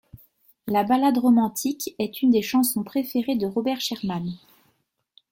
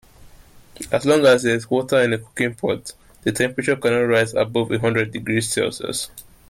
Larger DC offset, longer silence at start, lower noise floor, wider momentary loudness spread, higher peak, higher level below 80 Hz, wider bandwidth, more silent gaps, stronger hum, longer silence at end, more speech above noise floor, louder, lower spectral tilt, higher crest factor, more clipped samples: neither; about the same, 0.15 s vs 0.2 s; first, -70 dBFS vs -46 dBFS; about the same, 10 LU vs 11 LU; second, -10 dBFS vs -4 dBFS; second, -64 dBFS vs -52 dBFS; about the same, 17 kHz vs 16 kHz; neither; neither; first, 0.95 s vs 0.3 s; first, 48 dB vs 26 dB; second, -23 LUFS vs -20 LUFS; about the same, -4.5 dB/octave vs -4.5 dB/octave; about the same, 14 dB vs 16 dB; neither